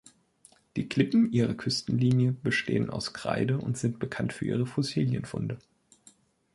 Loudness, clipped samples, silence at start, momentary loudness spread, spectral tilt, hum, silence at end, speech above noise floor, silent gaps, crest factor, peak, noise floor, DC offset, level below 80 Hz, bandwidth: -29 LUFS; under 0.1%; 0.75 s; 10 LU; -6 dB/octave; none; 0.95 s; 34 dB; none; 18 dB; -10 dBFS; -61 dBFS; under 0.1%; -58 dBFS; 11.5 kHz